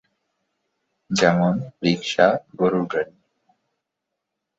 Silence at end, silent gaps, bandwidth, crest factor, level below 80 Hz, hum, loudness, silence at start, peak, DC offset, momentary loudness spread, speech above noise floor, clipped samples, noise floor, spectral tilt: 1.55 s; none; 8 kHz; 22 dB; -62 dBFS; none; -21 LUFS; 1.1 s; -2 dBFS; under 0.1%; 8 LU; 61 dB; under 0.1%; -81 dBFS; -5.5 dB/octave